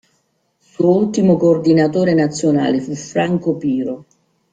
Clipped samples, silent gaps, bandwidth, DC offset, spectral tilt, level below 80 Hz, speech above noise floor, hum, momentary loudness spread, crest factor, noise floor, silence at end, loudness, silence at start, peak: under 0.1%; none; 9.2 kHz; under 0.1%; -7 dB/octave; -56 dBFS; 49 dB; none; 8 LU; 14 dB; -64 dBFS; 0.5 s; -16 LUFS; 0.8 s; -2 dBFS